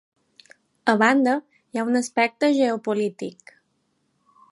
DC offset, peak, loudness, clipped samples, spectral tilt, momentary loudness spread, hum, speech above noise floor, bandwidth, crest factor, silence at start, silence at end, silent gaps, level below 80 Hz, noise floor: under 0.1%; -4 dBFS; -22 LUFS; under 0.1%; -4.5 dB/octave; 12 LU; none; 49 dB; 11.5 kHz; 20 dB; 0.85 s; 1.2 s; none; -78 dBFS; -70 dBFS